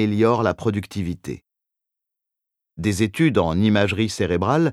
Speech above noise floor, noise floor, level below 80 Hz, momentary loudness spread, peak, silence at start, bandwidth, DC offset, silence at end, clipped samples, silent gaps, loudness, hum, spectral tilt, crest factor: 64 dB; -84 dBFS; -48 dBFS; 10 LU; -4 dBFS; 0 s; 14 kHz; under 0.1%; 0 s; under 0.1%; none; -21 LUFS; none; -6.5 dB/octave; 18 dB